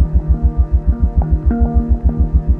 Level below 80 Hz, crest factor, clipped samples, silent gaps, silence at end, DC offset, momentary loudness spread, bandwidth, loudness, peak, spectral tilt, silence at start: -14 dBFS; 12 dB; under 0.1%; none; 0 s; under 0.1%; 1 LU; 1.9 kHz; -16 LUFS; -2 dBFS; -12.5 dB/octave; 0 s